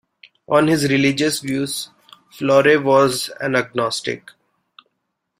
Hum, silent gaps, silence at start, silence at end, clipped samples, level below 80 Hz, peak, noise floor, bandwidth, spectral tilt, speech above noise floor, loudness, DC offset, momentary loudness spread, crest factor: none; none; 0.5 s; 1.2 s; under 0.1%; -58 dBFS; -2 dBFS; -75 dBFS; 16 kHz; -4.5 dB/octave; 57 dB; -18 LUFS; under 0.1%; 12 LU; 18 dB